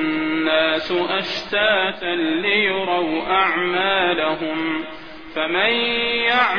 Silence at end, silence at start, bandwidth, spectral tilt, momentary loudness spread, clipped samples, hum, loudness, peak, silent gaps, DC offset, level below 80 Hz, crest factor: 0 s; 0 s; 5.4 kHz; -5 dB/octave; 6 LU; under 0.1%; none; -19 LUFS; -4 dBFS; none; 0.8%; -52 dBFS; 16 dB